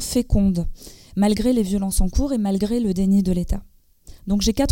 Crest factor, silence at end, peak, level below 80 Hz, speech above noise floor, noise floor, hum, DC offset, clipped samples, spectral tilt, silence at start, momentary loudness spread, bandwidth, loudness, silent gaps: 14 dB; 0 s; -6 dBFS; -28 dBFS; 26 dB; -45 dBFS; none; under 0.1%; under 0.1%; -6 dB/octave; 0 s; 11 LU; 17 kHz; -21 LUFS; none